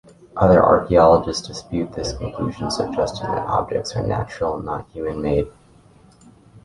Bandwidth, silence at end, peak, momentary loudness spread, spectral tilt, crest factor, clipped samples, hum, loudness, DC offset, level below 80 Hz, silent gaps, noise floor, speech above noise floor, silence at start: 11.5 kHz; 0.05 s; -2 dBFS; 14 LU; -6 dB/octave; 18 dB; under 0.1%; none; -20 LUFS; under 0.1%; -40 dBFS; none; -50 dBFS; 31 dB; 0.35 s